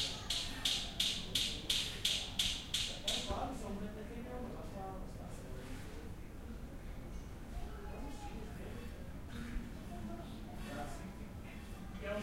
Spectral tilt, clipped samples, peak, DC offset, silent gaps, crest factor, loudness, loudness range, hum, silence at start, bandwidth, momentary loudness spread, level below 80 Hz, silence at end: -2.5 dB/octave; under 0.1%; -18 dBFS; under 0.1%; none; 24 dB; -41 LUFS; 13 LU; none; 0 s; 16 kHz; 15 LU; -50 dBFS; 0 s